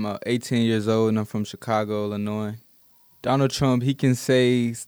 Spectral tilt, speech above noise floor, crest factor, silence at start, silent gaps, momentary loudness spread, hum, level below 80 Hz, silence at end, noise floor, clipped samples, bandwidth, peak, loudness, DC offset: -6 dB/octave; 34 dB; 16 dB; 0 s; none; 10 LU; none; -58 dBFS; 0.05 s; -56 dBFS; under 0.1%; over 20 kHz; -8 dBFS; -23 LUFS; under 0.1%